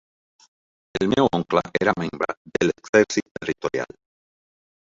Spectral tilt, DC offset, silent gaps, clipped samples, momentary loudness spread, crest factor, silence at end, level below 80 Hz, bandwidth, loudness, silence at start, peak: -5 dB/octave; under 0.1%; 2.37-2.45 s, 2.89-2.93 s, 3.31-3.35 s; under 0.1%; 11 LU; 22 dB; 1 s; -56 dBFS; 7.8 kHz; -23 LUFS; 0.95 s; -2 dBFS